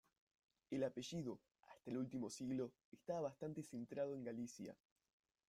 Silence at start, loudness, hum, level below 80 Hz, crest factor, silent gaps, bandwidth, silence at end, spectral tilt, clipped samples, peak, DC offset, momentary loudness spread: 0.7 s; -48 LUFS; none; -82 dBFS; 18 dB; 2.84-2.92 s; 14.5 kHz; 0.75 s; -6 dB/octave; under 0.1%; -32 dBFS; under 0.1%; 13 LU